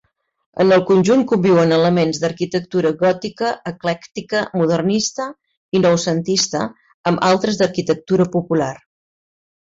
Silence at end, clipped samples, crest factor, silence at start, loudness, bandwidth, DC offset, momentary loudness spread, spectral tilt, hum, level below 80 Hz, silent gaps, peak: 0.85 s; under 0.1%; 14 dB; 0.55 s; -17 LUFS; 7.8 kHz; under 0.1%; 10 LU; -5 dB/octave; none; -56 dBFS; 5.57-5.72 s, 6.94-7.04 s; -4 dBFS